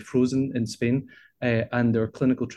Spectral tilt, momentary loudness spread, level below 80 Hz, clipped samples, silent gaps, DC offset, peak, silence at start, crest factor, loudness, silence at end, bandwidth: -7 dB/octave; 5 LU; -58 dBFS; under 0.1%; none; under 0.1%; -10 dBFS; 0 s; 14 dB; -25 LUFS; 0 s; 11.5 kHz